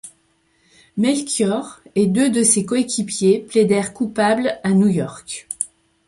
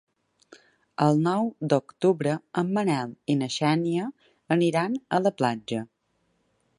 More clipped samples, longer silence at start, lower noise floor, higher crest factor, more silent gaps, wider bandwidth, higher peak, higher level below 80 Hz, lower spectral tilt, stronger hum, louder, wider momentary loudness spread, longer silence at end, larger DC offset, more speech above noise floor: neither; second, 0.05 s vs 1 s; second, -62 dBFS vs -72 dBFS; about the same, 16 dB vs 20 dB; neither; about the same, 11.5 kHz vs 11.5 kHz; first, -2 dBFS vs -6 dBFS; first, -58 dBFS vs -72 dBFS; second, -4.5 dB/octave vs -6.5 dB/octave; neither; first, -18 LUFS vs -26 LUFS; first, 11 LU vs 8 LU; second, 0.4 s vs 0.95 s; neither; about the same, 44 dB vs 47 dB